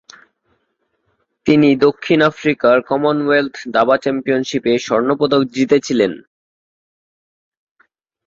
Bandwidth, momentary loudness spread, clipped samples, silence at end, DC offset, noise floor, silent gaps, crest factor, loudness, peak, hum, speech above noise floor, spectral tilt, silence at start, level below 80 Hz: 7.6 kHz; 5 LU; under 0.1%; 2.05 s; under 0.1%; -68 dBFS; none; 16 dB; -15 LUFS; -2 dBFS; none; 54 dB; -5.5 dB/octave; 1.45 s; -58 dBFS